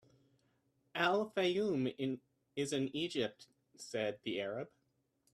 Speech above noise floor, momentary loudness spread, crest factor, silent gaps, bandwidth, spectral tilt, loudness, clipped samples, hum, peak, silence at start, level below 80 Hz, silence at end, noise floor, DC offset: 43 dB; 12 LU; 22 dB; none; 14 kHz; -4.5 dB/octave; -38 LUFS; under 0.1%; none; -16 dBFS; 0.95 s; -80 dBFS; 0.65 s; -80 dBFS; under 0.1%